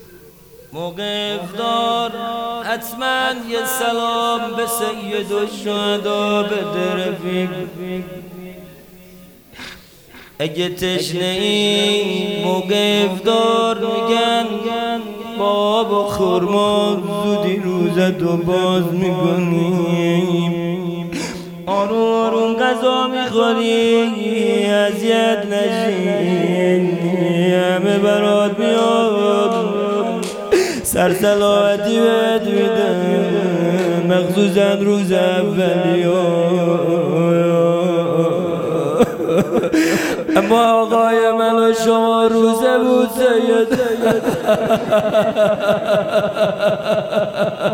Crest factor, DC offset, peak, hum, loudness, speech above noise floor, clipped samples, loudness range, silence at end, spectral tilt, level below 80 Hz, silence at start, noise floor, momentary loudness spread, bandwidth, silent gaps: 16 dB; under 0.1%; 0 dBFS; none; -16 LUFS; 26 dB; under 0.1%; 6 LU; 0 s; -5.5 dB/octave; -52 dBFS; 0 s; -42 dBFS; 7 LU; 19.5 kHz; none